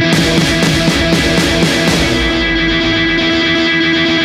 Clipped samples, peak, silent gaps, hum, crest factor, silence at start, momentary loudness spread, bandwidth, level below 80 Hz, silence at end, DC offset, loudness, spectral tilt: under 0.1%; 0 dBFS; none; none; 12 dB; 0 s; 1 LU; 15.5 kHz; -26 dBFS; 0 s; under 0.1%; -11 LUFS; -4 dB/octave